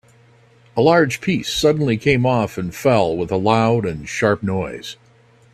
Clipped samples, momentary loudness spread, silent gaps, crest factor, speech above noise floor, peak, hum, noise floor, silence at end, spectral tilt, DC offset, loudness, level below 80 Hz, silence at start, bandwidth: under 0.1%; 9 LU; none; 18 dB; 34 dB; 0 dBFS; none; -52 dBFS; 0.6 s; -6 dB/octave; under 0.1%; -18 LUFS; -48 dBFS; 0.75 s; 15.5 kHz